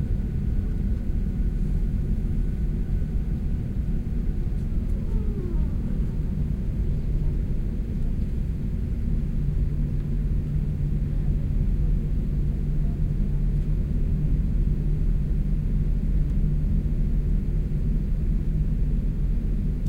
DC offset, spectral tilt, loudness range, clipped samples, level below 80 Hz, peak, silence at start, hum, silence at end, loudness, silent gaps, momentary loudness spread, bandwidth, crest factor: under 0.1%; -10 dB/octave; 2 LU; under 0.1%; -24 dBFS; -12 dBFS; 0 s; none; 0 s; -28 LUFS; none; 3 LU; 3.4 kHz; 12 dB